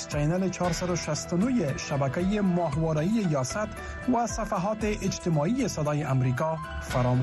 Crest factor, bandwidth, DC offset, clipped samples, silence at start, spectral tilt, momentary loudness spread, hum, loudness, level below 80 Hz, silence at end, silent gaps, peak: 12 dB; 12.5 kHz; under 0.1%; under 0.1%; 0 s; -6 dB/octave; 4 LU; none; -28 LUFS; -44 dBFS; 0 s; none; -16 dBFS